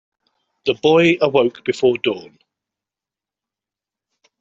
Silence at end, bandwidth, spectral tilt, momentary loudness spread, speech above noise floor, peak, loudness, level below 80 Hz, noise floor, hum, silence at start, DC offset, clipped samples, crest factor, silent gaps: 2.2 s; 7.8 kHz; -6 dB/octave; 10 LU; 72 dB; -2 dBFS; -17 LUFS; -62 dBFS; -88 dBFS; none; 0.65 s; under 0.1%; under 0.1%; 18 dB; none